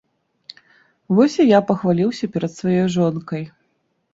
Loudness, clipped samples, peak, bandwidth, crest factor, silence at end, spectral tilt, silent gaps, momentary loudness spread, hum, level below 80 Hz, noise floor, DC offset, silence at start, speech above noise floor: -18 LUFS; under 0.1%; -2 dBFS; 7.8 kHz; 18 dB; 0.65 s; -7 dB/octave; none; 14 LU; none; -60 dBFS; -68 dBFS; under 0.1%; 1.1 s; 51 dB